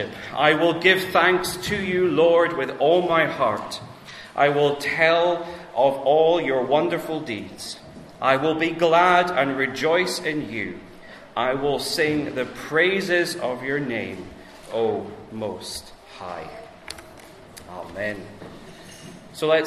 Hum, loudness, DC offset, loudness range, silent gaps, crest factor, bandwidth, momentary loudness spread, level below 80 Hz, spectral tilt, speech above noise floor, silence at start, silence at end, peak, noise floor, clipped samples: none; -21 LUFS; under 0.1%; 13 LU; none; 20 dB; 14 kHz; 20 LU; -56 dBFS; -4.5 dB/octave; 23 dB; 0 s; 0 s; -2 dBFS; -44 dBFS; under 0.1%